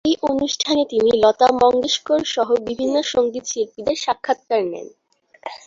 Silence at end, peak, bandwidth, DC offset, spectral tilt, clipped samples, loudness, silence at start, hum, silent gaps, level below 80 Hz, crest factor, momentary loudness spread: 0.1 s; -2 dBFS; 7.8 kHz; under 0.1%; -3 dB/octave; under 0.1%; -19 LUFS; 0.05 s; none; none; -56 dBFS; 18 dB; 10 LU